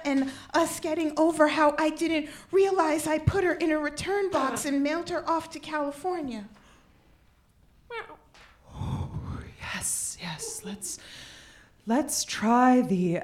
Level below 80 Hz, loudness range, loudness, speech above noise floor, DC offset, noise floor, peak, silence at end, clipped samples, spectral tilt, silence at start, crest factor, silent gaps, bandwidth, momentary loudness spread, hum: -52 dBFS; 13 LU; -27 LUFS; 35 dB; under 0.1%; -61 dBFS; -8 dBFS; 0 s; under 0.1%; -4.5 dB/octave; 0 s; 20 dB; none; 16.5 kHz; 17 LU; none